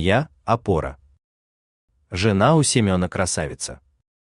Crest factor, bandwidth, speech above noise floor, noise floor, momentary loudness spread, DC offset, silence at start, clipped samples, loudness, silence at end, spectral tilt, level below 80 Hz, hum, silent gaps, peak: 20 dB; 12.5 kHz; over 70 dB; under -90 dBFS; 15 LU; under 0.1%; 0 s; under 0.1%; -20 LUFS; 0.6 s; -5 dB/octave; -46 dBFS; none; 1.24-1.88 s; -2 dBFS